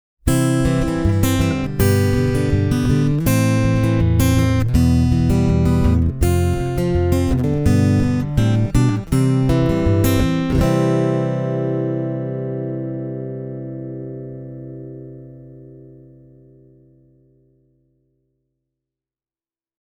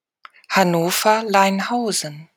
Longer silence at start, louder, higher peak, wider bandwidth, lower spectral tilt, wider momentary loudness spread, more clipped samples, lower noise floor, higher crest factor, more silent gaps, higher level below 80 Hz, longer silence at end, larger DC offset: second, 0.25 s vs 0.5 s; about the same, -18 LUFS vs -18 LUFS; about the same, -2 dBFS vs -2 dBFS; about the same, over 20 kHz vs 19.5 kHz; first, -7 dB/octave vs -3.5 dB/octave; first, 14 LU vs 6 LU; neither; first, under -90 dBFS vs -48 dBFS; about the same, 16 dB vs 18 dB; neither; first, -28 dBFS vs -70 dBFS; first, 3.85 s vs 0.15 s; neither